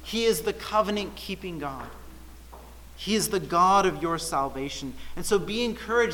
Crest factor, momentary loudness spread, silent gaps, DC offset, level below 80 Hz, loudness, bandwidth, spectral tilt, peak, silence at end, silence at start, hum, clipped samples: 18 dB; 18 LU; none; under 0.1%; -46 dBFS; -26 LUFS; 19 kHz; -3.5 dB/octave; -10 dBFS; 0 s; 0 s; none; under 0.1%